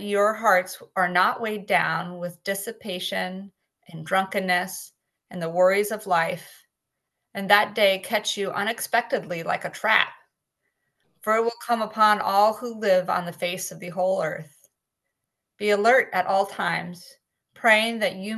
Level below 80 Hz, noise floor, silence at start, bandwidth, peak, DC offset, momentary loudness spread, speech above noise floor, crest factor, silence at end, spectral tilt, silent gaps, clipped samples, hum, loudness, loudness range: -76 dBFS; -82 dBFS; 0 s; 13 kHz; 0 dBFS; under 0.1%; 13 LU; 58 dB; 24 dB; 0 s; -3.5 dB/octave; none; under 0.1%; none; -23 LUFS; 4 LU